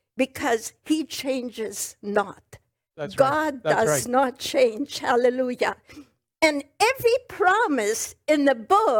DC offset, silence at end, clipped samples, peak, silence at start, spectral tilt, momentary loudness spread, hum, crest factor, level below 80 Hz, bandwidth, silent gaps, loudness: under 0.1%; 0 s; under 0.1%; -6 dBFS; 0.15 s; -3.5 dB/octave; 9 LU; none; 18 dB; -64 dBFS; 19.5 kHz; none; -23 LUFS